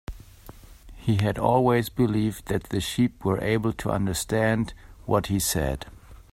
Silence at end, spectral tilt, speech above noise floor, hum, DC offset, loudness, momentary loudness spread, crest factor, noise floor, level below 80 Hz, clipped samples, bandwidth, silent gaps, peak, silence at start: 0.1 s; -5.5 dB/octave; 22 dB; none; under 0.1%; -25 LUFS; 11 LU; 20 dB; -47 dBFS; -44 dBFS; under 0.1%; 16 kHz; none; -6 dBFS; 0.1 s